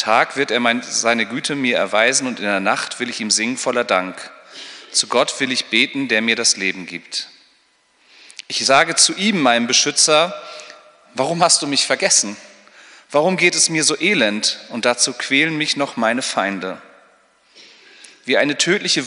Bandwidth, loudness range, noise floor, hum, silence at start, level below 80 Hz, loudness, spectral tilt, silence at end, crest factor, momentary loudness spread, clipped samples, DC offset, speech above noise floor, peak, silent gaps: 11 kHz; 4 LU; -58 dBFS; none; 0 s; -72 dBFS; -16 LUFS; -1.5 dB/octave; 0 s; 18 dB; 15 LU; under 0.1%; under 0.1%; 41 dB; 0 dBFS; none